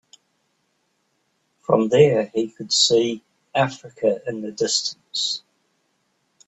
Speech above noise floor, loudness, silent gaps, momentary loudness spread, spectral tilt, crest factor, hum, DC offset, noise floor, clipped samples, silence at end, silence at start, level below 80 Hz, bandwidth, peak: 49 dB; -21 LUFS; none; 11 LU; -3.5 dB/octave; 22 dB; none; under 0.1%; -70 dBFS; under 0.1%; 1.1 s; 1.7 s; -66 dBFS; 8.4 kHz; -2 dBFS